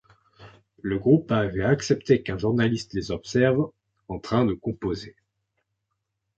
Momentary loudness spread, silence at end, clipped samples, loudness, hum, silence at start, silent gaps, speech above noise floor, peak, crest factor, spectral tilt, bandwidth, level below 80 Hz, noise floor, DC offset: 13 LU; 1.25 s; under 0.1%; -24 LUFS; none; 0.4 s; none; 56 dB; -6 dBFS; 20 dB; -6.5 dB/octave; 8.2 kHz; -50 dBFS; -80 dBFS; under 0.1%